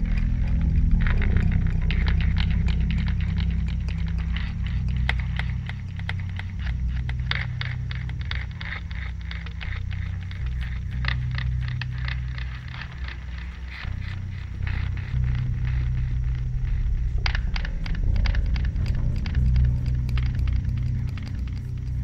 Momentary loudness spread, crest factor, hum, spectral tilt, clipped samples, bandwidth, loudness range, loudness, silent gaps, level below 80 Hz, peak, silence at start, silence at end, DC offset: 9 LU; 18 dB; none; -7 dB/octave; under 0.1%; 6.2 kHz; 6 LU; -27 LUFS; none; -26 dBFS; -6 dBFS; 0 s; 0 s; under 0.1%